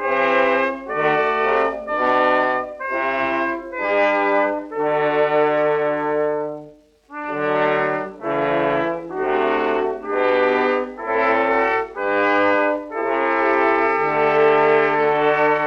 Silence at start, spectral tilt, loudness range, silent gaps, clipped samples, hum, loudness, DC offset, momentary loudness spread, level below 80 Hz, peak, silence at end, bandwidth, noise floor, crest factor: 0 s; -6.5 dB/octave; 4 LU; none; under 0.1%; none; -19 LUFS; under 0.1%; 7 LU; -54 dBFS; -4 dBFS; 0 s; 7 kHz; -45 dBFS; 16 dB